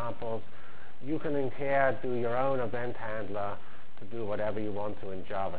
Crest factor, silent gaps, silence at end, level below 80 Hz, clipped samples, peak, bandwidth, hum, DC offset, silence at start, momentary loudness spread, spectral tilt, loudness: 20 dB; none; 0 s; -58 dBFS; under 0.1%; -14 dBFS; 4 kHz; none; 4%; 0 s; 18 LU; -10 dB/octave; -33 LUFS